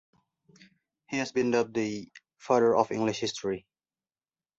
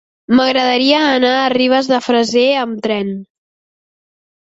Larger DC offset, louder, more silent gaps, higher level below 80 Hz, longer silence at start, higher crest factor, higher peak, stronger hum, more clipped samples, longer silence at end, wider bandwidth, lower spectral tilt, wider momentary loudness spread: neither; second, -28 LUFS vs -13 LUFS; neither; second, -68 dBFS vs -58 dBFS; first, 1.1 s vs 0.3 s; first, 22 dB vs 14 dB; second, -8 dBFS vs 0 dBFS; neither; neither; second, 1 s vs 1.35 s; about the same, 8 kHz vs 8 kHz; about the same, -5 dB/octave vs -4 dB/octave; first, 13 LU vs 7 LU